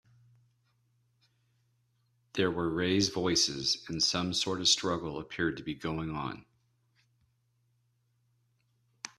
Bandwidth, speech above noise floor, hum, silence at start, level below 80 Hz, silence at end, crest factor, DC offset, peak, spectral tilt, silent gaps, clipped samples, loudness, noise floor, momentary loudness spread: 14 kHz; 43 dB; none; 2.35 s; -62 dBFS; 0.1 s; 22 dB; under 0.1%; -12 dBFS; -3 dB/octave; none; under 0.1%; -30 LUFS; -74 dBFS; 12 LU